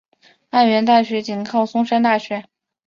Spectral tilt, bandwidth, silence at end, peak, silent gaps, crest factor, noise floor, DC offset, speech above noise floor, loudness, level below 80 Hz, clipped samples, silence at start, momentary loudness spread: -5.5 dB/octave; 7.2 kHz; 0.45 s; -2 dBFS; none; 16 dB; -39 dBFS; under 0.1%; 22 dB; -17 LUFS; -66 dBFS; under 0.1%; 0.55 s; 9 LU